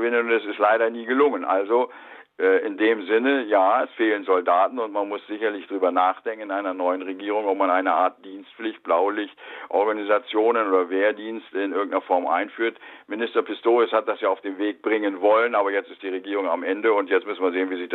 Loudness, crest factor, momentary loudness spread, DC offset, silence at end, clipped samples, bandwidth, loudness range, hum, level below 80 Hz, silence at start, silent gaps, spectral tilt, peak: -23 LUFS; 16 dB; 9 LU; under 0.1%; 0 s; under 0.1%; 4.2 kHz; 3 LU; none; -78 dBFS; 0 s; none; -6.5 dB/octave; -6 dBFS